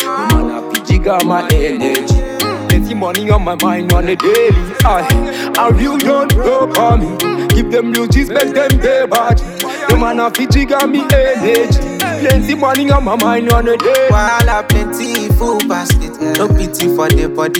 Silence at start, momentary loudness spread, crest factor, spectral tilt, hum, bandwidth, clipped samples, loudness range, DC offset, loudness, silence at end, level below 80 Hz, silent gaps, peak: 0 s; 4 LU; 12 dB; -5.5 dB/octave; none; 18 kHz; under 0.1%; 2 LU; under 0.1%; -12 LUFS; 0 s; -18 dBFS; none; 0 dBFS